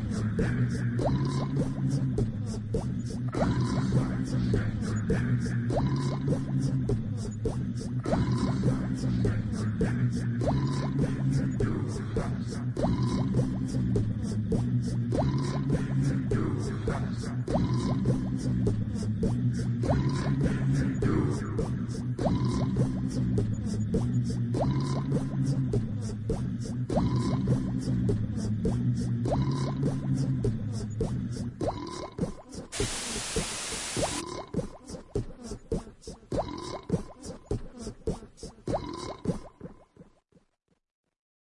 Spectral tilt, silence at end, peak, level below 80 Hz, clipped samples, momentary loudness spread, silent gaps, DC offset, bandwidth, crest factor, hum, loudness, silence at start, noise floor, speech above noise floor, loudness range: -7 dB/octave; 1.5 s; -12 dBFS; -42 dBFS; under 0.1%; 8 LU; none; under 0.1%; 11.5 kHz; 16 dB; none; -30 LUFS; 0 s; -73 dBFS; 45 dB; 8 LU